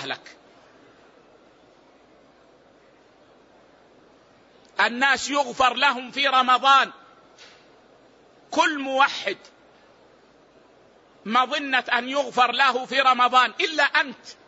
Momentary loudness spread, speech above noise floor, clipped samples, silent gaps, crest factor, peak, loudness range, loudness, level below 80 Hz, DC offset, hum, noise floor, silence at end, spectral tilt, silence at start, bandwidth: 11 LU; 34 dB; under 0.1%; none; 20 dB; -6 dBFS; 6 LU; -21 LUFS; -68 dBFS; under 0.1%; none; -55 dBFS; 0.15 s; -1.5 dB/octave; 0 s; 8 kHz